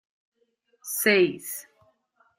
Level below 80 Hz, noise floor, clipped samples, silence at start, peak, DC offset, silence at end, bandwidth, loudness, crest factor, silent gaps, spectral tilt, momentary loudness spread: -74 dBFS; -70 dBFS; under 0.1%; 0.85 s; -6 dBFS; under 0.1%; 0.75 s; 16 kHz; -24 LUFS; 24 dB; none; -3 dB/octave; 17 LU